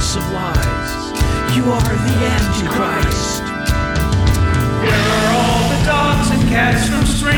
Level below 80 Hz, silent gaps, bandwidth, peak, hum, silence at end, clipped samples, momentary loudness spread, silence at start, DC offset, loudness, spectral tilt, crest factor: -22 dBFS; none; over 20 kHz; -2 dBFS; none; 0 s; under 0.1%; 5 LU; 0 s; under 0.1%; -16 LUFS; -5 dB/octave; 14 dB